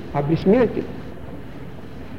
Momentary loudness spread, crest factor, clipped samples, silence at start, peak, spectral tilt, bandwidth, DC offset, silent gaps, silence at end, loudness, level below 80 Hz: 20 LU; 16 dB; under 0.1%; 0 s; -6 dBFS; -9 dB/octave; 7.2 kHz; 2%; none; 0 s; -19 LUFS; -44 dBFS